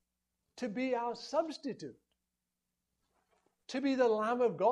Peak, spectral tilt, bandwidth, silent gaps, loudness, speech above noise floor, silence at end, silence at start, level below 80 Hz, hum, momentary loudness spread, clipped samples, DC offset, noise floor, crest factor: -18 dBFS; -5 dB/octave; 10.5 kHz; none; -34 LUFS; 55 dB; 0 s; 0.55 s; -82 dBFS; none; 13 LU; under 0.1%; under 0.1%; -88 dBFS; 18 dB